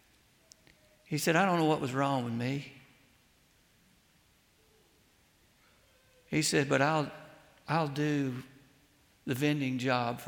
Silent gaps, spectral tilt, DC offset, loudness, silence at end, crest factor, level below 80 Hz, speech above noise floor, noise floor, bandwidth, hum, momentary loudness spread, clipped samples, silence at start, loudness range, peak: none; -5 dB/octave; under 0.1%; -31 LUFS; 0 s; 20 dB; -70 dBFS; 37 dB; -67 dBFS; 17.5 kHz; none; 13 LU; under 0.1%; 1.1 s; 7 LU; -14 dBFS